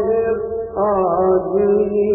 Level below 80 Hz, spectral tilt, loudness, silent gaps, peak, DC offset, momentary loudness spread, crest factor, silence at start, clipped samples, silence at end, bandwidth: -44 dBFS; -14 dB/octave; -17 LUFS; none; -6 dBFS; under 0.1%; 5 LU; 12 dB; 0 s; under 0.1%; 0 s; 2.9 kHz